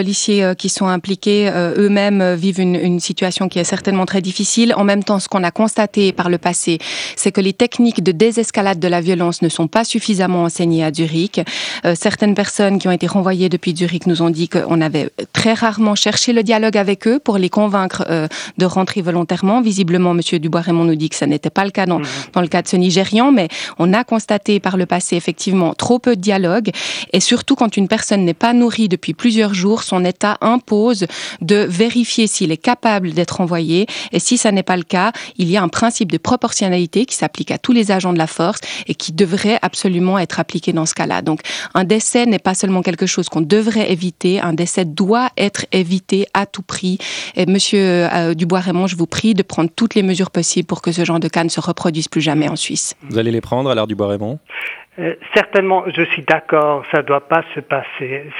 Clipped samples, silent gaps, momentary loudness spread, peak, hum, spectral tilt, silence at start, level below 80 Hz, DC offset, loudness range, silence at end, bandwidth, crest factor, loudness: under 0.1%; none; 5 LU; 0 dBFS; none; -4.5 dB/octave; 0 s; -60 dBFS; under 0.1%; 2 LU; 0 s; 11.5 kHz; 16 dB; -16 LUFS